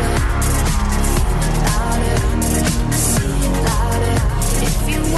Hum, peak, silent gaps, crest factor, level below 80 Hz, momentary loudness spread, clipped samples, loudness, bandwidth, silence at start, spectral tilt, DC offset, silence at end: none; -6 dBFS; none; 10 dB; -18 dBFS; 2 LU; under 0.1%; -18 LUFS; 13 kHz; 0 s; -4.5 dB/octave; under 0.1%; 0 s